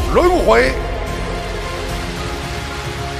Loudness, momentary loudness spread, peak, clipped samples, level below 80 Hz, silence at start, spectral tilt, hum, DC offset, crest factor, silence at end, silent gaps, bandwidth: -18 LUFS; 11 LU; 0 dBFS; under 0.1%; -26 dBFS; 0 s; -5 dB/octave; none; under 0.1%; 16 dB; 0 s; none; 15.5 kHz